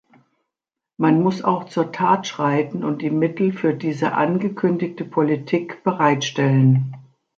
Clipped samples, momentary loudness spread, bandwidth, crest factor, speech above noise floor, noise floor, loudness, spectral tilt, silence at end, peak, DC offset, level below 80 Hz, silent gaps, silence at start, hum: under 0.1%; 7 LU; 7.4 kHz; 16 dB; 67 dB; -86 dBFS; -20 LUFS; -7 dB/octave; 0.35 s; -4 dBFS; under 0.1%; -66 dBFS; none; 1 s; none